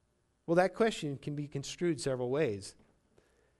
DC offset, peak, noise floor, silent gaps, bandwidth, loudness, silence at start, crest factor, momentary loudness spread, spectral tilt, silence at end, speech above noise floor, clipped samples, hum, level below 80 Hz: under 0.1%; -14 dBFS; -69 dBFS; none; 11.5 kHz; -33 LUFS; 0.5 s; 20 dB; 12 LU; -5.5 dB/octave; 0.9 s; 36 dB; under 0.1%; none; -66 dBFS